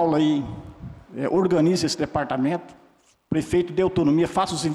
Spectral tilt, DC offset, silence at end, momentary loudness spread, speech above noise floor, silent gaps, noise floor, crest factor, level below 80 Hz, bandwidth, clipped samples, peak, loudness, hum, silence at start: -6 dB/octave; under 0.1%; 0 s; 16 LU; 37 dB; none; -58 dBFS; 10 dB; -50 dBFS; 12.5 kHz; under 0.1%; -12 dBFS; -23 LUFS; none; 0 s